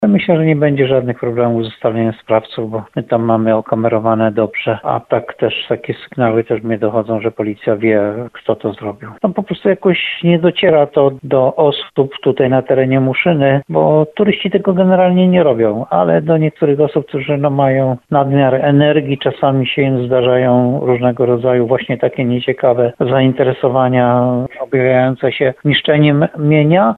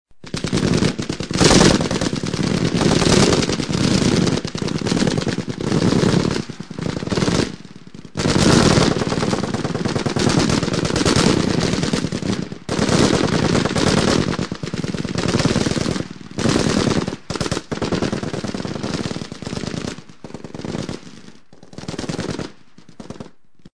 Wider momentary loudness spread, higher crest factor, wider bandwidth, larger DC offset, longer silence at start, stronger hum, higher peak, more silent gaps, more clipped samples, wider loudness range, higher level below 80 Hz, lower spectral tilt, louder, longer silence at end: second, 7 LU vs 15 LU; second, 12 dB vs 20 dB; second, 4.4 kHz vs 10.5 kHz; second, under 0.1% vs 0.8%; about the same, 0 s vs 0.05 s; neither; about the same, 0 dBFS vs 0 dBFS; neither; neither; second, 4 LU vs 12 LU; second, -52 dBFS vs -36 dBFS; first, -9.5 dB/octave vs -5 dB/octave; first, -13 LUFS vs -19 LUFS; about the same, 0 s vs 0.05 s